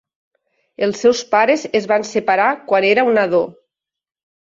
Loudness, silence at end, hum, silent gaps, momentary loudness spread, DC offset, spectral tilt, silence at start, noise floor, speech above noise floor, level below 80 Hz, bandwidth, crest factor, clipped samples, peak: -16 LUFS; 1 s; none; none; 6 LU; under 0.1%; -4 dB/octave; 0.8 s; -76 dBFS; 61 dB; -64 dBFS; 7.8 kHz; 16 dB; under 0.1%; -2 dBFS